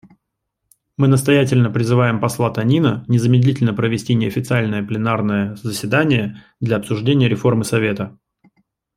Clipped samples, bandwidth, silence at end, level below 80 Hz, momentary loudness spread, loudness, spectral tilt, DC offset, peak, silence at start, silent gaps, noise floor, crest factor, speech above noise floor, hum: under 0.1%; 14.5 kHz; 0.85 s; -54 dBFS; 7 LU; -17 LUFS; -6.5 dB/octave; under 0.1%; -2 dBFS; 1 s; none; -76 dBFS; 16 dB; 60 dB; none